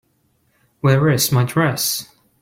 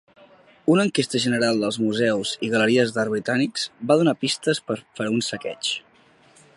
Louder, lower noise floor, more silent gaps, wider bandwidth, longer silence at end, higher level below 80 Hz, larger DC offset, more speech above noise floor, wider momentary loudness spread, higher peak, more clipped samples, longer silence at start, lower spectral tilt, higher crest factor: first, -17 LUFS vs -22 LUFS; first, -63 dBFS vs -55 dBFS; neither; first, 16.5 kHz vs 11.5 kHz; second, 0.35 s vs 0.75 s; first, -52 dBFS vs -66 dBFS; neither; first, 47 dB vs 34 dB; about the same, 6 LU vs 8 LU; about the same, -4 dBFS vs -4 dBFS; neither; first, 0.85 s vs 0.65 s; about the same, -4.5 dB/octave vs -4.5 dB/octave; about the same, 16 dB vs 18 dB